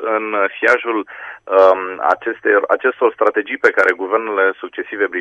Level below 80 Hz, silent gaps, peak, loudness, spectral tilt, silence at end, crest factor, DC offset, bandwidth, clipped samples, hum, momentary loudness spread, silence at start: -66 dBFS; none; 0 dBFS; -16 LUFS; -4 dB/octave; 0 s; 16 dB; under 0.1%; 9 kHz; under 0.1%; none; 9 LU; 0 s